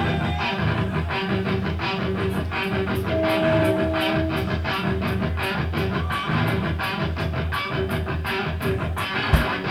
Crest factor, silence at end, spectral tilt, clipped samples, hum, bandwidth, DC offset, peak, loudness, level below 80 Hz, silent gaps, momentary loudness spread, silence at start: 20 dB; 0 s; -6.5 dB/octave; under 0.1%; none; 16 kHz; under 0.1%; -4 dBFS; -24 LUFS; -34 dBFS; none; 4 LU; 0 s